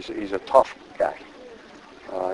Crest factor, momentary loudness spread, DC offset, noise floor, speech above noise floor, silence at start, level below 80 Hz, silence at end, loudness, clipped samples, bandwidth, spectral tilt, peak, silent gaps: 24 dB; 24 LU; under 0.1%; -46 dBFS; 23 dB; 0 s; -58 dBFS; 0 s; -24 LUFS; under 0.1%; 11 kHz; -5 dB/octave; -2 dBFS; none